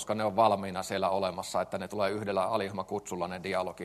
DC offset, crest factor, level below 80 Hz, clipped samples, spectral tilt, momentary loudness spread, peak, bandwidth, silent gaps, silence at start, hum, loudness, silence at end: under 0.1%; 20 dB; -68 dBFS; under 0.1%; -4.5 dB/octave; 9 LU; -12 dBFS; 13 kHz; none; 0 s; none; -31 LUFS; 0 s